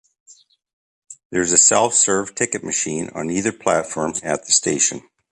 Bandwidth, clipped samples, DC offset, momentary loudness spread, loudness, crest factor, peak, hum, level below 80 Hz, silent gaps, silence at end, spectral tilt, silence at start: 11.5 kHz; under 0.1%; under 0.1%; 12 LU; -17 LUFS; 20 dB; 0 dBFS; none; -56 dBFS; 1.25-1.30 s; 0.35 s; -2 dB/octave; 1.1 s